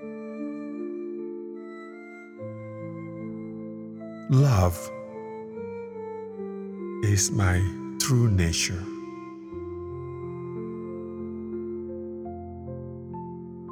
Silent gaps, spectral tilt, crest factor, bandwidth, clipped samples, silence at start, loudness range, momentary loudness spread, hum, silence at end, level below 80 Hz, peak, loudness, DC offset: none; -5 dB/octave; 20 dB; 17 kHz; under 0.1%; 0 s; 11 LU; 16 LU; none; 0 s; -48 dBFS; -10 dBFS; -30 LUFS; under 0.1%